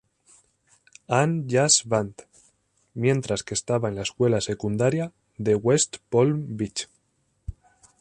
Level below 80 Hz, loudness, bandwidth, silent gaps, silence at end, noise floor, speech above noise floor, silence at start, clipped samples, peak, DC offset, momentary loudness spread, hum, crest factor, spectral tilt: -52 dBFS; -24 LUFS; 11 kHz; none; 0.5 s; -70 dBFS; 47 dB; 1.1 s; under 0.1%; -6 dBFS; under 0.1%; 17 LU; none; 20 dB; -4.5 dB/octave